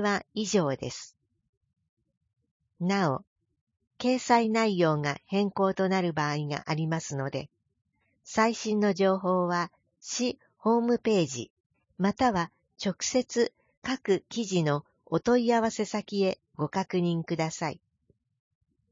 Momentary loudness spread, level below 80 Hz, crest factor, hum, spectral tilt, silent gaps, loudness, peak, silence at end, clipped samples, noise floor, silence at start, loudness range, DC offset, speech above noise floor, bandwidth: 10 LU; -64 dBFS; 20 dB; none; -5 dB/octave; 1.49-1.61 s, 1.89-1.97 s, 2.17-2.21 s, 2.51-2.60 s, 3.27-3.36 s, 3.61-3.67 s, 11.50-11.70 s, 13.77-13.82 s; -28 LUFS; -10 dBFS; 1.15 s; under 0.1%; -71 dBFS; 0 s; 5 LU; under 0.1%; 44 dB; 7.8 kHz